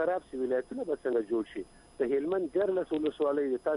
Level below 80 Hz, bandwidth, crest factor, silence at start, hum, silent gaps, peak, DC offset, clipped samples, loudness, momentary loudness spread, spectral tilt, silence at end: -64 dBFS; 10.5 kHz; 14 dB; 0 s; none; none; -18 dBFS; under 0.1%; under 0.1%; -31 LUFS; 6 LU; -6.5 dB/octave; 0 s